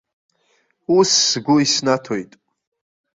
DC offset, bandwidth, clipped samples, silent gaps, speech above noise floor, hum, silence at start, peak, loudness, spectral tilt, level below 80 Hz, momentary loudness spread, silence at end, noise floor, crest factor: under 0.1%; 7.8 kHz; under 0.1%; none; 47 dB; none; 0.9 s; -2 dBFS; -16 LUFS; -3 dB/octave; -62 dBFS; 14 LU; 0.9 s; -64 dBFS; 18 dB